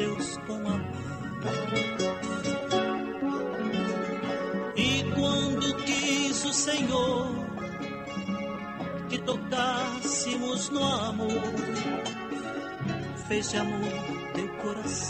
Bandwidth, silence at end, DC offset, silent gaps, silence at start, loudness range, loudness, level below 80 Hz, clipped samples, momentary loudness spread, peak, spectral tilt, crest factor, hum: 13 kHz; 0 s; under 0.1%; none; 0 s; 4 LU; -30 LUFS; -56 dBFS; under 0.1%; 9 LU; -16 dBFS; -4 dB/octave; 14 dB; none